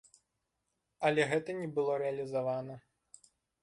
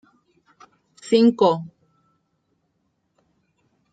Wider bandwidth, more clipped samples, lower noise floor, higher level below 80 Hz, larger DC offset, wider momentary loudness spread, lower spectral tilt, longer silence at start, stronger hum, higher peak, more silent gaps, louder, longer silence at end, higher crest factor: first, 11.5 kHz vs 9 kHz; neither; first, -84 dBFS vs -71 dBFS; about the same, -76 dBFS vs -72 dBFS; neither; second, 10 LU vs 26 LU; about the same, -5.5 dB/octave vs -6.5 dB/octave; about the same, 1 s vs 1.05 s; neither; second, -16 dBFS vs -4 dBFS; neither; second, -34 LUFS vs -19 LUFS; second, 0.85 s vs 2.25 s; about the same, 20 dB vs 20 dB